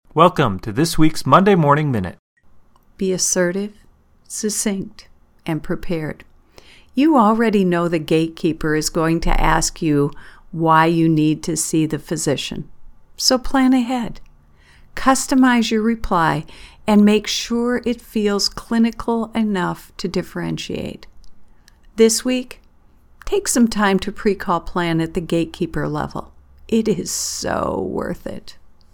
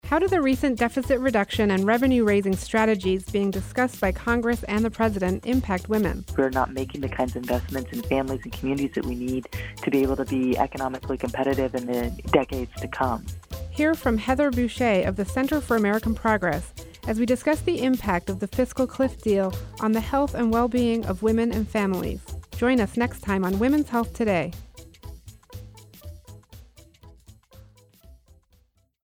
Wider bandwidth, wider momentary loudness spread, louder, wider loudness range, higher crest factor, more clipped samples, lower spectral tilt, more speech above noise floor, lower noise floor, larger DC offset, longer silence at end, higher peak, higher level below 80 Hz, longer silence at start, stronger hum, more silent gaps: about the same, 19 kHz vs 19.5 kHz; first, 14 LU vs 9 LU; first, -18 LUFS vs -24 LUFS; about the same, 5 LU vs 4 LU; about the same, 18 dB vs 20 dB; neither; second, -4.5 dB/octave vs -6 dB/octave; second, 32 dB vs 39 dB; second, -50 dBFS vs -63 dBFS; neither; second, 0.25 s vs 0.9 s; first, 0 dBFS vs -4 dBFS; first, -34 dBFS vs -40 dBFS; about the same, 0.15 s vs 0.05 s; neither; first, 2.19-2.36 s vs none